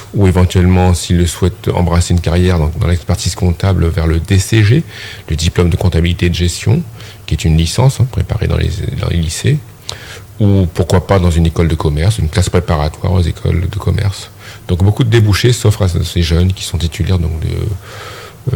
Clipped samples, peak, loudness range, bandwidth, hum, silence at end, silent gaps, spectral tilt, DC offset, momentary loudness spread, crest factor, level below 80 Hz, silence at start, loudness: under 0.1%; 0 dBFS; 2 LU; 19 kHz; none; 0 s; none; -6 dB/octave; under 0.1%; 11 LU; 12 dB; -26 dBFS; 0 s; -13 LUFS